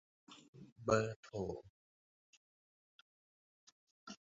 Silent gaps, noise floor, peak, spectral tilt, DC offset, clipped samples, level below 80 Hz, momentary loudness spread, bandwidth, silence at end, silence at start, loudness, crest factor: 0.48-0.53 s, 0.72-0.76 s, 1.16-1.23 s, 1.70-4.07 s; under -90 dBFS; -18 dBFS; -5.5 dB/octave; under 0.1%; under 0.1%; -70 dBFS; 25 LU; 7.6 kHz; 0.1 s; 0.3 s; -40 LUFS; 26 dB